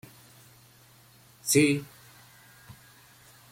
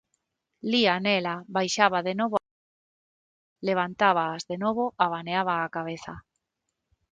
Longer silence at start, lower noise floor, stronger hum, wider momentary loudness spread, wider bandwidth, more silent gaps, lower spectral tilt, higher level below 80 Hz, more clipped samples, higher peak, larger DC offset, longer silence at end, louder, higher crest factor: first, 1.45 s vs 0.65 s; second, -57 dBFS vs -82 dBFS; neither; first, 29 LU vs 11 LU; first, 16.5 kHz vs 9.4 kHz; second, none vs 2.51-3.56 s; about the same, -4 dB/octave vs -4 dB/octave; about the same, -68 dBFS vs -66 dBFS; neither; second, -8 dBFS vs -4 dBFS; neither; first, 1.7 s vs 0.9 s; about the same, -25 LUFS vs -26 LUFS; about the same, 24 dB vs 24 dB